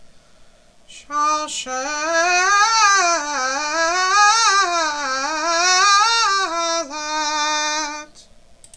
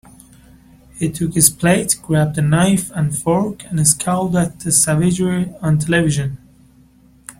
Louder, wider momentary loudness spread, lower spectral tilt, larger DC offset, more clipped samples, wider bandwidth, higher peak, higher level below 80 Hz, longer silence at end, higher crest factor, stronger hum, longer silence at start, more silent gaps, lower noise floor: about the same, -17 LUFS vs -16 LUFS; about the same, 11 LU vs 9 LU; second, 1.5 dB/octave vs -4.5 dB/octave; first, 0.2% vs under 0.1%; neither; second, 11 kHz vs 16.5 kHz; about the same, -2 dBFS vs 0 dBFS; second, -54 dBFS vs -44 dBFS; first, 0.7 s vs 0.1 s; about the same, 16 dB vs 18 dB; neither; second, 0 s vs 0.95 s; neither; about the same, -49 dBFS vs -49 dBFS